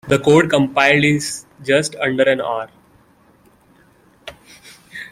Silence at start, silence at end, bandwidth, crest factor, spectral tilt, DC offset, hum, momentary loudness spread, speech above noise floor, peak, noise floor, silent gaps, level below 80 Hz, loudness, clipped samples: 0.05 s; 0.05 s; 16 kHz; 18 dB; -4.5 dB/octave; under 0.1%; none; 24 LU; 37 dB; 0 dBFS; -53 dBFS; none; -54 dBFS; -16 LUFS; under 0.1%